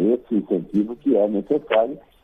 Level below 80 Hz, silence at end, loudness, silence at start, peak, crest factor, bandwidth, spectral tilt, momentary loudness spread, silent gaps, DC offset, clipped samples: -58 dBFS; 0.25 s; -22 LUFS; 0 s; -6 dBFS; 16 dB; 3.8 kHz; -9 dB/octave; 4 LU; none; under 0.1%; under 0.1%